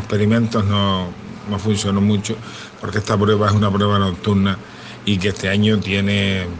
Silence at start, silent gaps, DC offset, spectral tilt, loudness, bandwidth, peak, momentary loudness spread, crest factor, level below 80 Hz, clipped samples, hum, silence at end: 0 s; none; under 0.1%; -6 dB/octave; -18 LUFS; 9.4 kHz; -2 dBFS; 11 LU; 16 dB; -48 dBFS; under 0.1%; none; 0 s